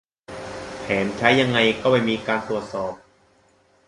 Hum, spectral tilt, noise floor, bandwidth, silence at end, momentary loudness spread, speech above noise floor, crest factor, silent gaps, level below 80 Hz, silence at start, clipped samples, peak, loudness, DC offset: none; -5 dB/octave; -59 dBFS; 11.5 kHz; 0.9 s; 17 LU; 39 dB; 20 dB; none; -54 dBFS; 0.3 s; under 0.1%; -2 dBFS; -21 LUFS; under 0.1%